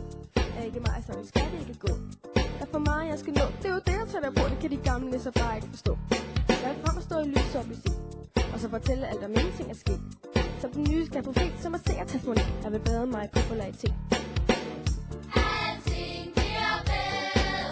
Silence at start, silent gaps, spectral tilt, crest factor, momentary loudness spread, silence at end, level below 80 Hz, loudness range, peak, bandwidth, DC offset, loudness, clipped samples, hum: 0 s; none; -6 dB/octave; 18 dB; 6 LU; 0 s; -34 dBFS; 1 LU; -10 dBFS; 8 kHz; under 0.1%; -30 LUFS; under 0.1%; none